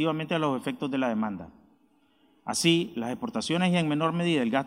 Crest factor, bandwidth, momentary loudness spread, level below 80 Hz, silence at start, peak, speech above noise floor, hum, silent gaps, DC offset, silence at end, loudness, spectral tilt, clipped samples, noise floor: 18 dB; 15.5 kHz; 9 LU; -68 dBFS; 0 s; -10 dBFS; 38 dB; none; none; under 0.1%; 0 s; -27 LUFS; -5 dB/octave; under 0.1%; -65 dBFS